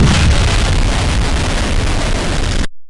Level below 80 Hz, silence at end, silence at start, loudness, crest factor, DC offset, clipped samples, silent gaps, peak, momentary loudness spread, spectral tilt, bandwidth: -16 dBFS; 0 s; 0 s; -15 LUFS; 10 dB; under 0.1%; under 0.1%; none; -2 dBFS; 5 LU; -4.5 dB/octave; 11.5 kHz